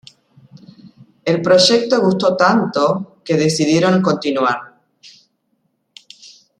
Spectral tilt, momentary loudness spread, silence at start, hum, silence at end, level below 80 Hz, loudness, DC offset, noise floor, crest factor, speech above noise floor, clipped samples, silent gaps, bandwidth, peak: -5 dB/octave; 9 LU; 0.85 s; none; 1.5 s; -62 dBFS; -15 LUFS; under 0.1%; -67 dBFS; 18 dB; 52 dB; under 0.1%; none; 11.5 kHz; 0 dBFS